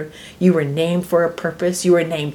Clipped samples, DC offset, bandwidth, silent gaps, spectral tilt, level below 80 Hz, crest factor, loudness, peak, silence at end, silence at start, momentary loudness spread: under 0.1%; under 0.1%; 18.5 kHz; none; -6 dB/octave; -54 dBFS; 16 dB; -18 LUFS; -2 dBFS; 0 s; 0 s; 5 LU